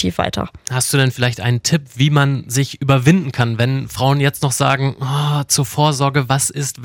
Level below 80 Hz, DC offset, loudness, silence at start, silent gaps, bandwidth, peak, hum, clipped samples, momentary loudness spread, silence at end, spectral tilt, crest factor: -46 dBFS; under 0.1%; -16 LUFS; 0 s; none; 17 kHz; -2 dBFS; none; under 0.1%; 5 LU; 0 s; -4.5 dB/octave; 14 dB